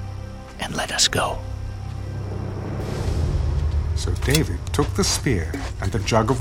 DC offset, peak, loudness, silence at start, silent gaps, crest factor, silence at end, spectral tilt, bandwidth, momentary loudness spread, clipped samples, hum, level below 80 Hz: under 0.1%; -2 dBFS; -23 LUFS; 0 s; none; 20 dB; 0 s; -4 dB/octave; 16.5 kHz; 13 LU; under 0.1%; none; -28 dBFS